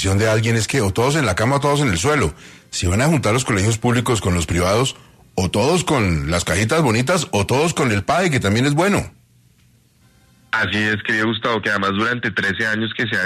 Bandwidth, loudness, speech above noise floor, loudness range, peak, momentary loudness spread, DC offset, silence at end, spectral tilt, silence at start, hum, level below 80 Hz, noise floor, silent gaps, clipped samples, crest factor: 14 kHz; -18 LUFS; 37 dB; 3 LU; -4 dBFS; 4 LU; under 0.1%; 0 s; -4.5 dB/octave; 0 s; none; -42 dBFS; -55 dBFS; none; under 0.1%; 14 dB